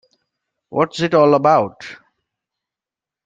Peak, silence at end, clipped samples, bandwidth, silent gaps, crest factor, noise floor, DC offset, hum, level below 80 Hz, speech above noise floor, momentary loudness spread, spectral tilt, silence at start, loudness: -2 dBFS; 1.3 s; under 0.1%; 7.8 kHz; none; 18 dB; -88 dBFS; under 0.1%; none; -64 dBFS; 73 dB; 19 LU; -6.5 dB/octave; 0.7 s; -16 LUFS